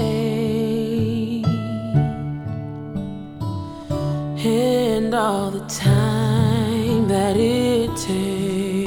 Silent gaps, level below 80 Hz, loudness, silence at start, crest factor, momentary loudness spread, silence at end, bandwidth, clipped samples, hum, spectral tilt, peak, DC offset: none; -44 dBFS; -21 LUFS; 0 s; 16 dB; 11 LU; 0 s; 18.5 kHz; under 0.1%; none; -6.5 dB/octave; -6 dBFS; under 0.1%